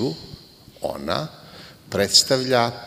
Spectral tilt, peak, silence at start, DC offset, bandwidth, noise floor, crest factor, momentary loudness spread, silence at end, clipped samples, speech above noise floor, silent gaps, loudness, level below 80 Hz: -3 dB/octave; -2 dBFS; 0 s; under 0.1%; 16 kHz; -44 dBFS; 22 dB; 21 LU; 0 s; under 0.1%; 23 dB; none; -20 LUFS; -54 dBFS